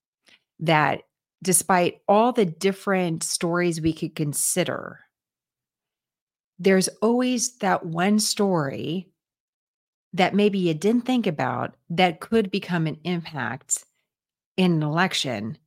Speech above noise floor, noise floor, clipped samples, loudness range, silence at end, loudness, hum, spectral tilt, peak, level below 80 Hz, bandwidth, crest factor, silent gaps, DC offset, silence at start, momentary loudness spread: over 67 dB; under -90 dBFS; under 0.1%; 4 LU; 0.1 s; -23 LUFS; none; -4.5 dB/octave; -2 dBFS; -62 dBFS; 16.5 kHz; 22 dB; 6.21-6.27 s, 6.40-6.53 s, 9.40-10.11 s, 14.46-14.55 s; under 0.1%; 0.6 s; 10 LU